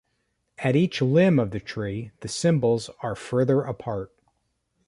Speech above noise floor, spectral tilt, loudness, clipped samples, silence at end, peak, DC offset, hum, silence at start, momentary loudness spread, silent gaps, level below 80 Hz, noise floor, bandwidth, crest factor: 50 dB; -6.5 dB/octave; -24 LUFS; under 0.1%; 0.8 s; -8 dBFS; under 0.1%; none; 0.6 s; 13 LU; none; -56 dBFS; -74 dBFS; 11.5 kHz; 16 dB